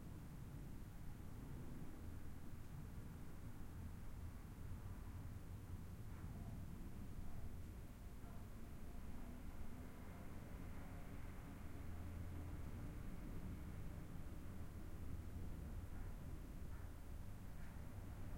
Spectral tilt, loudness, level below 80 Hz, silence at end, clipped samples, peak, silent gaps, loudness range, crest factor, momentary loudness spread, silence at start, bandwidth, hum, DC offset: -7 dB/octave; -55 LUFS; -56 dBFS; 0 s; under 0.1%; -36 dBFS; none; 2 LU; 14 dB; 4 LU; 0 s; 16.5 kHz; none; under 0.1%